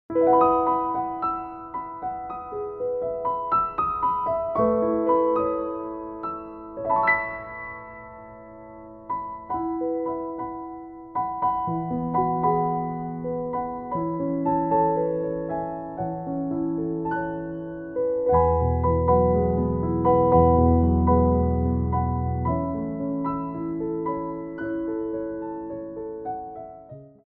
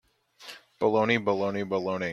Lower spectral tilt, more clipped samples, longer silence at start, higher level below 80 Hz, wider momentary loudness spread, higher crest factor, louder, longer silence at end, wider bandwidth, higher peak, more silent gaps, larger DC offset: first, -12.5 dB/octave vs -6 dB/octave; neither; second, 0.1 s vs 0.4 s; first, -38 dBFS vs -68 dBFS; second, 14 LU vs 21 LU; about the same, 18 dB vs 18 dB; about the same, -25 LUFS vs -27 LUFS; first, 0.2 s vs 0 s; second, 4.3 kHz vs 13 kHz; first, -6 dBFS vs -10 dBFS; neither; neither